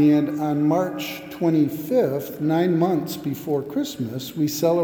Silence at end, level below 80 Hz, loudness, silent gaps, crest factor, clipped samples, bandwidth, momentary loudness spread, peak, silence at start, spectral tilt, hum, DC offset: 0 s; -64 dBFS; -23 LUFS; none; 14 dB; under 0.1%; over 20 kHz; 9 LU; -8 dBFS; 0 s; -6.5 dB/octave; none; under 0.1%